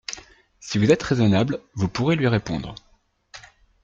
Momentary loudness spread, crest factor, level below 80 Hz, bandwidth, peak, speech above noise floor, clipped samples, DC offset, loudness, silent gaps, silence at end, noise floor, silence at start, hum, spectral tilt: 23 LU; 20 dB; -50 dBFS; 8.6 kHz; -4 dBFS; 32 dB; under 0.1%; under 0.1%; -22 LUFS; none; 0.45 s; -53 dBFS; 0.1 s; none; -6 dB/octave